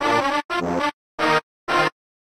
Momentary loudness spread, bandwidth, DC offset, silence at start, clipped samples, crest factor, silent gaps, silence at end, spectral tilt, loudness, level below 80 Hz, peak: 4 LU; 15.5 kHz; under 0.1%; 0 s; under 0.1%; 16 dB; 0.45-0.49 s, 0.93-1.18 s, 1.43-1.67 s; 0.45 s; -4 dB/octave; -22 LUFS; -56 dBFS; -6 dBFS